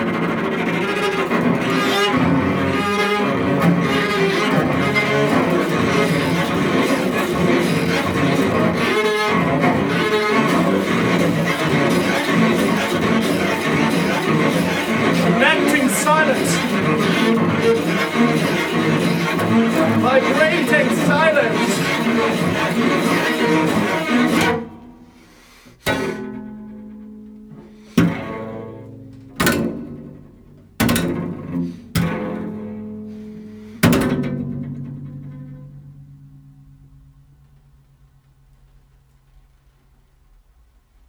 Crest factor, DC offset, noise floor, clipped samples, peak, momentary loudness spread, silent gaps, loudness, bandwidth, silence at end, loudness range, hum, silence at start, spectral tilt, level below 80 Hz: 18 dB; under 0.1%; -54 dBFS; under 0.1%; 0 dBFS; 16 LU; none; -17 LUFS; over 20 kHz; 4.7 s; 8 LU; none; 0 s; -5 dB/octave; -48 dBFS